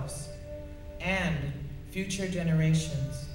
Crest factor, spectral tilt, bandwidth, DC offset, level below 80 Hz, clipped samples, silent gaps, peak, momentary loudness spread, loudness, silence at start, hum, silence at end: 18 dB; -5.5 dB/octave; 16.5 kHz; under 0.1%; -44 dBFS; under 0.1%; none; -14 dBFS; 16 LU; -31 LUFS; 0 s; none; 0 s